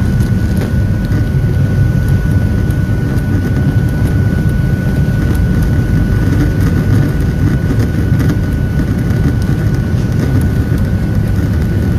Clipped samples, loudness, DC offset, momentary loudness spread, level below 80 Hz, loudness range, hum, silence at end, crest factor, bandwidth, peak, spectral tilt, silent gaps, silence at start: under 0.1%; -13 LUFS; under 0.1%; 2 LU; -18 dBFS; 1 LU; none; 0 s; 10 dB; 14.5 kHz; 0 dBFS; -8 dB/octave; none; 0 s